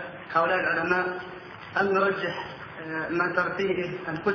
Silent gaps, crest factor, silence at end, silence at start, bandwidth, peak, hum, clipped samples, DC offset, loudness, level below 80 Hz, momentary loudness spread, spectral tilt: none; 18 dB; 0 s; 0 s; 5.4 kHz; -10 dBFS; none; under 0.1%; under 0.1%; -27 LUFS; -62 dBFS; 13 LU; -6.5 dB/octave